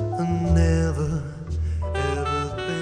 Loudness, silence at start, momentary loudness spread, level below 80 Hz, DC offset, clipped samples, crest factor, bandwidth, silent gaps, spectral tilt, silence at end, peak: -24 LUFS; 0 s; 9 LU; -30 dBFS; under 0.1%; under 0.1%; 14 dB; 10 kHz; none; -7 dB/octave; 0 s; -8 dBFS